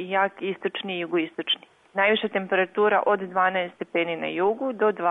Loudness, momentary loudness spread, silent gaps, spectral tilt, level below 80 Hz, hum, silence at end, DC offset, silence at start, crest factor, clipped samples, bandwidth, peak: -25 LUFS; 7 LU; none; -7 dB/octave; -74 dBFS; none; 0 s; under 0.1%; 0 s; 16 dB; under 0.1%; 4 kHz; -10 dBFS